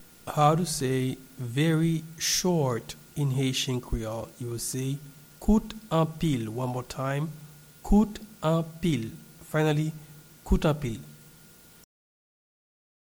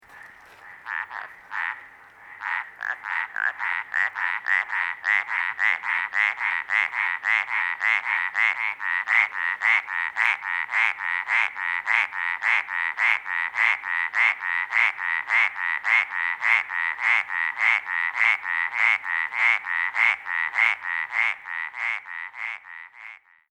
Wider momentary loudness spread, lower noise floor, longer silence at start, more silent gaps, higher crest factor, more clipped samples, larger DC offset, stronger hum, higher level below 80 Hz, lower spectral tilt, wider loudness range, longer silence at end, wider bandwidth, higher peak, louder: first, 14 LU vs 11 LU; first, -53 dBFS vs -47 dBFS; about the same, 0 s vs 0.1 s; neither; about the same, 20 dB vs 20 dB; neither; neither; neither; first, -40 dBFS vs -76 dBFS; first, -5.5 dB/octave vs 1 dB/octave; about the same, 4 LU vs 5 LU; first, 1.95 s vs 0.35 s; first, over 20 kHz vs 11 kHz; second, -10 dBFS vs -4 dBFS; second, -28 LUFS vs -23 LUFS